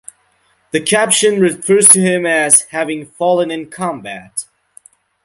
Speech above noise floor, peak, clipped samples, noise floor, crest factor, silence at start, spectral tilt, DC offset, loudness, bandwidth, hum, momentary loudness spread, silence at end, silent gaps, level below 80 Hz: 44 dB; 0 dBFS; 0.3%; -58 dBFS; 16 dB; 0.75 s; -2.5 dB/octave; under 0.1%; -12 LUFS; 16 kHz; none; 18 LU; 0.8 s; none; -60 dBFS